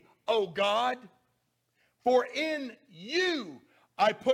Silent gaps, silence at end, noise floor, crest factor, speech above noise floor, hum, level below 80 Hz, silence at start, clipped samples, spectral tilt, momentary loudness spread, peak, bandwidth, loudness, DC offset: none; 0 s; -76 dBFS; 18 dB; 47 dB; none; -78 dBFS; 0.3 s; under 0.1%; -3.5 dB/octave; 14 LU; -12 dBFS; 15 kHz; -29 LUFS; under 0.1%